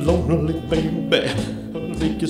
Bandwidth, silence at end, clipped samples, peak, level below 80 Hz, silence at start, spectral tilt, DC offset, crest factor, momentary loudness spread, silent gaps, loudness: 14.5 kHz; 0 s; under 0.1%; -4 dBFS; -34 dBFS; 0 s; -6.5 dB/octave; under 0.1%; 18 dB; 9 LU; none; -22 LUFS